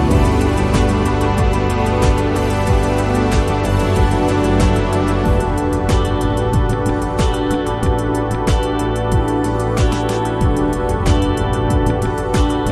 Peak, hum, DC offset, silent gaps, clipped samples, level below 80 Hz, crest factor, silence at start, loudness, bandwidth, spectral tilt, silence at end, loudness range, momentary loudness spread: -2 dBFS; none; under 0.1%; none; under 0.1%; -20 dBFS; 14 dB; 0 s; -17 LUFS; 13 kHz; -6.5 dB/octave; 0 s; 2 LU; 3 LU